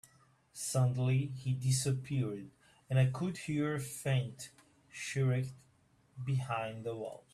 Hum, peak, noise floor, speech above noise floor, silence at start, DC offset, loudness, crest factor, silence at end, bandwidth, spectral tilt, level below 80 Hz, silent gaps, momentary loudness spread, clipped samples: none; -18 dBFS; -69 dBFS; 35 dB; 0.55 s; under 0.1%; -35 LUFS; 18 dB; 0.15 s; 13.5 kHz; -5.5 dB/octave; -68 dBFS; none; 13 LU; under 0.1%